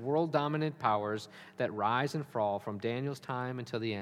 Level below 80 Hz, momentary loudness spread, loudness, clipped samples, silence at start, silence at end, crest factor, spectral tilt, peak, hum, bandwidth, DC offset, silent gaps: -80 dBFS; 7 LU; -34 LUFS; under 0.1%; 0 s; 0 s; 18 dB; -6.5 dB/octave; -14 dBFS; none; 15 kHz; under 0.1%; none